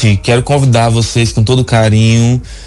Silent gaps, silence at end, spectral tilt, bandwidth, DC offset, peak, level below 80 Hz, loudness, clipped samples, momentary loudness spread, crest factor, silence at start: none; 0 s; -6 dB/octave; 11.5 kHz; under 0.1%; -2 dBFS; -30 dBFS; -10 LUFS; under 0.1%; 3 LU; 8 dB; 0 s